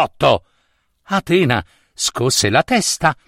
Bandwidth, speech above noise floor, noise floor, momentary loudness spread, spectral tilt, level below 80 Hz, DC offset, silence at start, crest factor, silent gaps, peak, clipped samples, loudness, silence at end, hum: 16.5 kHz; 47 dB; -64 dBFS; 7 LU; -3.5 dB/octave; -46 dBFS; under 0.1%; 0 s; 16 dB; none; 0 dBFS; under 0.1%; -16 LUFS; 0.15 s; none